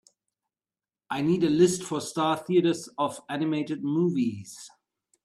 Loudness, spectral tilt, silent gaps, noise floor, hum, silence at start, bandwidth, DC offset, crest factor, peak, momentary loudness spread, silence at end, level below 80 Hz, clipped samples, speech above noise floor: -26 LUFS; -5.5 dB/octave; none; under -90 dBFS; none; 1.1 s; 13.5 kHz; under 0.1%; 18 dB; -10 dBFS; 10 LU; 0.55 s; -68 dBFS; under 0.1%; over 64 dB